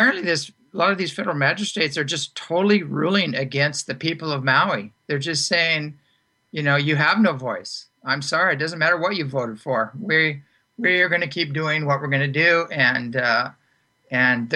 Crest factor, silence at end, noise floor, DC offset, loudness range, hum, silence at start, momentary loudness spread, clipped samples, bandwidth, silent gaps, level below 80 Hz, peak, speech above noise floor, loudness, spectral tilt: 16 dB; 0 s; -66 dBFS; under 0.1%; 2 LU; none; 0 s; 9 LU; under 0.1%; 11.5 kHz; none; -68 dBFS; -6 dBFS; 44 dB; -21 LUFS; -4.5 dB/octave